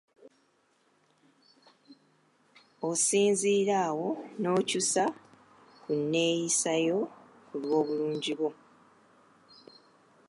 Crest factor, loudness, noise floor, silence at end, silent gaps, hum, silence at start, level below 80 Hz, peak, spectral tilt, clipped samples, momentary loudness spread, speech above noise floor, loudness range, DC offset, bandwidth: 16 dB; -29 LUFS; -70 dBFS; 1.75 s; none; none; 0.25 s; -84 dBFS; -14 dBFS; -3.5 dB/octave; under 0.1%; 11 LU; 41 dB; 5 LU; under 0.1%; 11.5 kHz